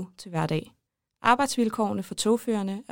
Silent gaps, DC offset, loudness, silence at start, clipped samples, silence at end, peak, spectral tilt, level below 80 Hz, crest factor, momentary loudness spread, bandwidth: none; under 0.1%; -26 LUFS; 0 s; under 0.1%; 0.1 s; -6 dBFS; -4.5 dB/octave; -62 dBFS; 20 dB; 8 LU; 17 kHz